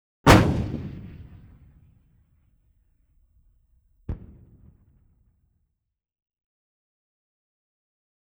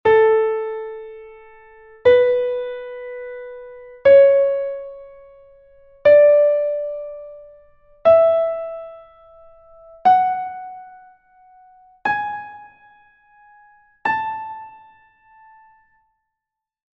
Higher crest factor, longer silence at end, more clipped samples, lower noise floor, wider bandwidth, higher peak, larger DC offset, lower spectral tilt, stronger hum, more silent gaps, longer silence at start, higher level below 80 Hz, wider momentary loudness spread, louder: first, 26 dB vs 16 dB; first, 4.05 s vs 2.25 s; neither; second, -79 dBFS vs -84 dBFS; first, over 20 kHz vs 5.6 kHz; about the same, -4 dBFS vs -4 dBFS; neither; about the same, -6 dB/octave vs -6 dB/octave; neither; neither; first, 0.25 s vs 0.05 s; first, -40 dBFS vs -58 dBFS; first, 28 LU vs 25 LU; second, -20 LUFS vs -17 LUFS